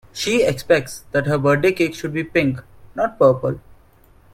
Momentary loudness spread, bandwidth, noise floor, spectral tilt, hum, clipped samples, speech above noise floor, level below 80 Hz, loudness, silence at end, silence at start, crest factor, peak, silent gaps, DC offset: 10 LU; 16.5 kHz; -51 dBFS; -5.5 dB/octave; none; under 0.1%; 32 dB; -48 dBFS; -19 LUFS; 0.75 s; 0.15 s; 18 dB; 0 dBFS; none; under 0.1%